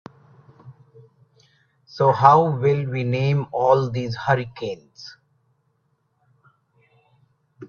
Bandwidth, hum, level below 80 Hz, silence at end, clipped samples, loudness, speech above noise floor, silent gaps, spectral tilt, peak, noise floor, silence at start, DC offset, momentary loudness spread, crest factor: 6.8 kHz; none; -62 dBFS; 0.05 s; under 0.1%; -20 LUFS; 49 dB; none; -7.5 dB/octave; 0 dBFS; -69 dBFS; 0.65 s; under 0.1%; 25 LU; 22 dB